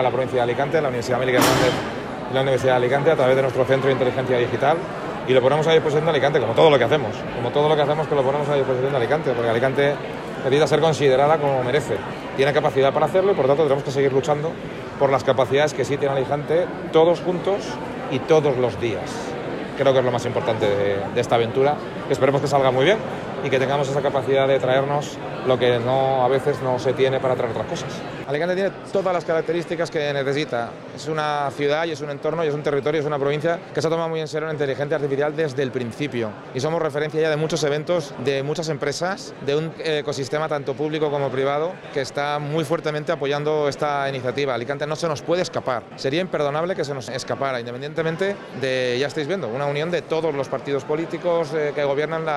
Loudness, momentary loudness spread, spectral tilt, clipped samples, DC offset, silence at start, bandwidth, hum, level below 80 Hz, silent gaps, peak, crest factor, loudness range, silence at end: -21 LUFS; 9 LU; -5.5 dB/octave; under 0.1%; under 0.1%; 0 s; 15 kHz; none; -54 dBFS; none; -4 dBFS; 18 dB; 5 LU; 0 s